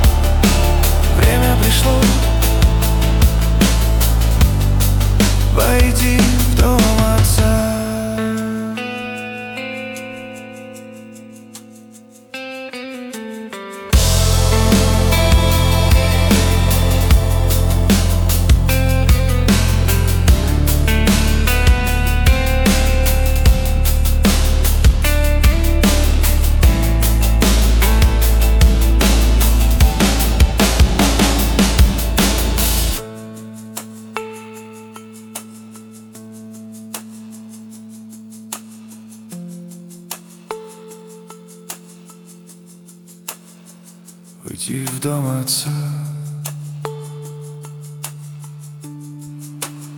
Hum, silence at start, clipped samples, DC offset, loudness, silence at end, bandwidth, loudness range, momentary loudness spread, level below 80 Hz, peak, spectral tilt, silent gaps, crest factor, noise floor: none; 0 s; under 0.1%; under 0.1%; -15 LUFS; 0 s; 19 kHz; 20 LU; 20 LU; -18 dBFS; -2 dBFS; -5 dB/octave; none; 14 dB; -42 dBFS